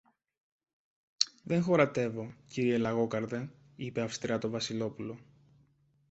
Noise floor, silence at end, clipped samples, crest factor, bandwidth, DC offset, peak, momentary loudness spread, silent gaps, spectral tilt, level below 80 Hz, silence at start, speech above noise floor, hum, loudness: -69 dBFS; 0.9 s; under 0.1%; 30 dB; 8.2 kHz; under 0.1%; -4 dBFS; 16 LU; none; -5 dB/octave; -68 dBFS; 1.2 s; 37 dB; none; -32 LUFS